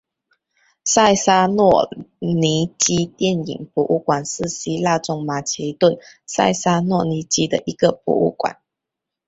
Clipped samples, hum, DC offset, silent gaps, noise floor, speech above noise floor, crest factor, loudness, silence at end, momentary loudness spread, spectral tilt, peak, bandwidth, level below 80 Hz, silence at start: under 0.1%; none; under 0.1%; none; -84 dBFS; 65 dB; 18 dB; -19 LUFS; 0.75 s; 10 LU; -4 dB/octave; -2 dBFS; 8.2 kHz; -54 dBFS; 0.85 s